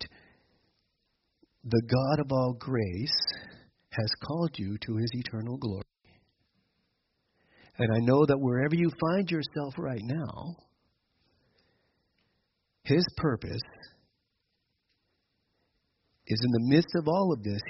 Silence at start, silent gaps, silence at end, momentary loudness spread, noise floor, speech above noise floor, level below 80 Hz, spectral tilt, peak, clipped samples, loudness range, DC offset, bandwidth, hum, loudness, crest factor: 0 s; none; 0 s; 14 LU; -79 dBFS; 51 dB; -60 dBFS; -5.5 dB/octave; -10 dBFS; under 0.1%; 9 LU; under 0.1%; 6 kHz; none; -29 LUFS; 20 dB